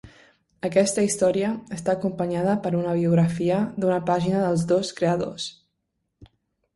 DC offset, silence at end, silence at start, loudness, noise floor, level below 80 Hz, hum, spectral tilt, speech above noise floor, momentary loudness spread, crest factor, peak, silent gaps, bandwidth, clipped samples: under 0.1%; 0.5 s; 0.05 s; -23 LUFS; -77 dBFS; -58 dBFS; none; -6 dB/octave; 55 dB; 7 LU; 18 dB; -6 dBFS; none; 11.5 kHz; under 0.1%